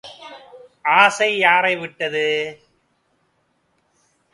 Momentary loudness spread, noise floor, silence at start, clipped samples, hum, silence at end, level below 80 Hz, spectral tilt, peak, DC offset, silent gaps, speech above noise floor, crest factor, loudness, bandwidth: 22 LU; -66 dBFS; 0.05 s; under 0.1%; none; 1.8 s; -70 dBFS; -2.5 dB/octave; 0 dBFS; under 0.1%; none; 48 dB; 20 dB; -17 LUFS; 11.5 kHz